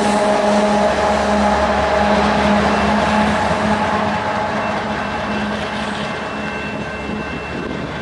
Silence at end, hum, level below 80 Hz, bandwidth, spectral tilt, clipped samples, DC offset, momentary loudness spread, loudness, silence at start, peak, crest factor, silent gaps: 0 s; none; -36 dBFS; 11.5 kHz; -5 dB/octave; under 0.1%; under 0.1%; 9 LU; -17 LUFS; 0 s; -4 dBFS; 14 dB; none